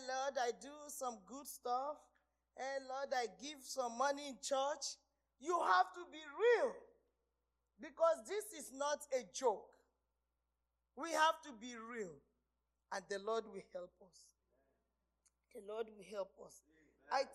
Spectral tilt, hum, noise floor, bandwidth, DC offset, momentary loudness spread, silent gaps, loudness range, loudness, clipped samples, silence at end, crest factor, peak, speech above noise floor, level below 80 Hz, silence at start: -1.5 dB/octave; 60 Hz at -85 dBFS; -89 dBFS; 15 kHz; under 0.1%; 17 LU; none; 11 LU; -41 LUFS; under 0.1%; 0 s; 24 dB; -20 dBFS; 47 dB; -84 dBFS; 0 s